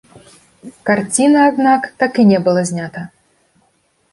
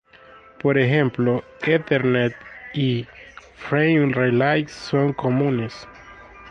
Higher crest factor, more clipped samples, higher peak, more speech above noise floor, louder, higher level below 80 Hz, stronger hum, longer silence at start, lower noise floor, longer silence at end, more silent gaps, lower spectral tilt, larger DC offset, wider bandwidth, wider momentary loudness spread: about the same, 14 dB vs 16 dB; neither; about the same, -2 dBFS vs -4 dBFS; first, 46 dB vs 28 dB; first, -14 LUFS vs -21 LUFS; about the same, -60 dBFS vs -56 dBFS; neither; about the same, 0.65 s vs 0.65 s; first, -60 dBFS vs -48 dBFS; first, 1.05 s vs 0 s; neither; second, -5 dB/octave vs -7.5 dB/octave; neither; first, 11.5 kHz vs 8.6 kHz; about the same, 15 LU vs 17 LU